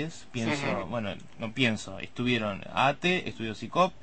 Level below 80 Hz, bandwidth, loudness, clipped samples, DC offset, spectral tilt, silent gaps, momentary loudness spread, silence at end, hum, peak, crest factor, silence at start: -58 dBFS; 8.8 kHz; -30 LUFS; under 0.1%; 0.5%; -5 dB/octave; none; 10 LU; 0.1 s; none; -10 dBFS; 20 dB; 0 s